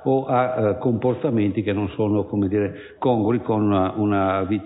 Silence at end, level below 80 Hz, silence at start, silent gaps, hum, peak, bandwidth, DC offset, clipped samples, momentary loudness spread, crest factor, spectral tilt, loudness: 0 s; -46 dBFS; 0 s; none; none; -8 dBFS; 4 kHz; under 0.1%; under 0.1%; 4 LU; 14 dB; -12.5 dB/octave; -22 LUFS